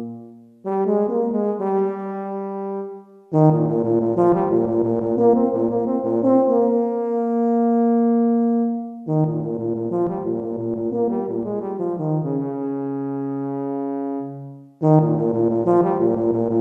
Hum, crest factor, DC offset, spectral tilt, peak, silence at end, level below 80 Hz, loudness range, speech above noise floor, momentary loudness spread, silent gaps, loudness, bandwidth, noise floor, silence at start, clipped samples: none; 16 dB; under 0.1%; -12 dB/octave; -4 dBFS; 0 s; -60 dBFS; 6 LU; 24 dB; 11 LU; none; -21 LUFS; 2.9 kHz; -41 dBFS; 0 s; under 0.1%